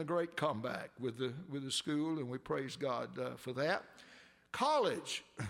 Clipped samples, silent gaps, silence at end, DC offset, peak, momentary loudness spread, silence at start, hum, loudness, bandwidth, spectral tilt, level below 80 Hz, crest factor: under 0.1%; none; 0 s; under 0.1%; -20 dBFS; 9 LU; 0 s; none; -38 LUFS; 16 kHz; -4.5 dB/octave; -76 dBFS; 18 dB